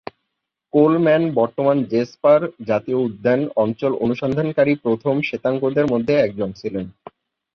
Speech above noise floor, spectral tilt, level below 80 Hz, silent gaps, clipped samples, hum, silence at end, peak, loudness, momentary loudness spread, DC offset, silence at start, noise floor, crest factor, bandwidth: 60 dB; -8.5 dB/octave; -56 dBFS; none; under 0.1%; none; 0.65 s; -2 dBFS; -19 LUFS; 8 LU; under 0.1%; 0.75 s; -78 dBFS; 16 dB; 6.6 kHz